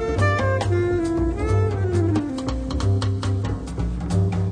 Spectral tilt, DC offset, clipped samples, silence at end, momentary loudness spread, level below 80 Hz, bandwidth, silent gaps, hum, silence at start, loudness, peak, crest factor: -7.5 dB/octave; under 0.1%; under 0.1%; 0 s; 6 LU; -32 dBFS; 10 kHz; none; none; 0 s; -23 LUFS; -8 dBFS; 12 dB